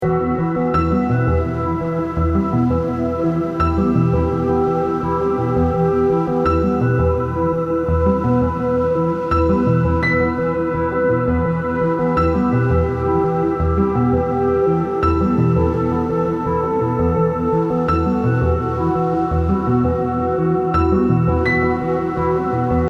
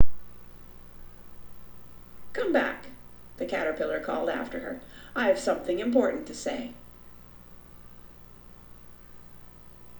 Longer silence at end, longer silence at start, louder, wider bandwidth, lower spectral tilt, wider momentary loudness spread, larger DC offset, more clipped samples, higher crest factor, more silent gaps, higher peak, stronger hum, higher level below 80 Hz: about the same, 0 s vs 0 s; about the same, 0 s vs 0 s; first, -18 LUFS vs -29 LUFS; second, 7.2 kHz vs over 20 kHz; first, -10 dB/octave vs -4.5 dB/octave; second, 3 LU vs 23 LU; neither; neither; second, 14 dB vs 22 dB; neither; about the same, -4 dBFS vs -6 dBFS; second, none vs 60 Hz at -50 dBFS; first, -30 dBFS vs -52 dBFS